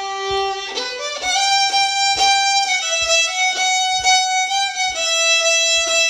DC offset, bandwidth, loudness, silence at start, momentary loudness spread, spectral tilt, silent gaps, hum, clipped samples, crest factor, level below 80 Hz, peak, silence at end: under 0.1%; 15.5 kHz; -15 LUFS; 0 s; 9 LU; 2 dB/octave; none; none; under 0.1%; 14 dB; -52 dBFS; -2 dBFS; 0 s